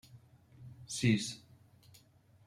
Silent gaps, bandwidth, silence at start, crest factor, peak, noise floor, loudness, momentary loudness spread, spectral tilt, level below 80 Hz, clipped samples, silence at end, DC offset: none; 15 kHz; 0.15 s; 22 dB; -18 dBFS; -65 dBFS; -34 LUFS; 24 LU; -4.5 dB/octave; -70 dBFS; under 0.1%; 1.1 s; under 0.1%